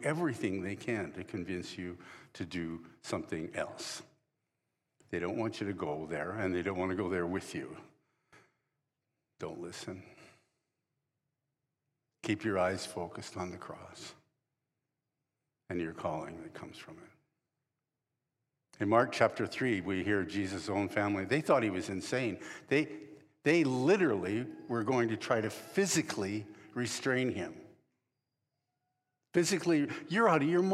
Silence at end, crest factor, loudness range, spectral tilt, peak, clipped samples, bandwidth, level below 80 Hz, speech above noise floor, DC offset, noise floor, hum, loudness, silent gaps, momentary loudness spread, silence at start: 0 s; 22 dB; 13 LU; -5 dB/octave; -12 dBFS; under 0.1%; 14.5 kHz; -72 dBFS; 55 dB; under 0.1%; -88 dBFS; none; -34 LUFS; none; 17 LU; 0 s